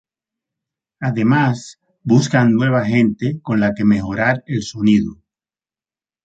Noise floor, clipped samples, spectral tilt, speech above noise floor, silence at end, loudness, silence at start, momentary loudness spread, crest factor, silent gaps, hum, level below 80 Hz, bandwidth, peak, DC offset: under -90 dBFS; under 0.1%; -7 dB/octave; over 74 dB; 1.1 s; -17 LUFS; 1 s; 10 LU; 16 dB; none; none; -48 dBFS; 8.2 kHz; -2 dBFS; under 0.1%